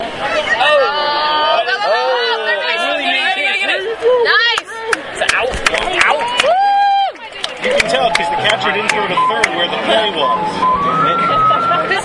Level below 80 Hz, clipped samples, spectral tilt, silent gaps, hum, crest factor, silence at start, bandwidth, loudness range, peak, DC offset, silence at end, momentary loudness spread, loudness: -42 dBFS; under 0.1%; -2.5 dB/octave; none; none; 14 dB; 0 s; 11.5 kHz; 1 LU; 0 dBFS; under 0.1%; 0 s; 5 LU; -13 LUFS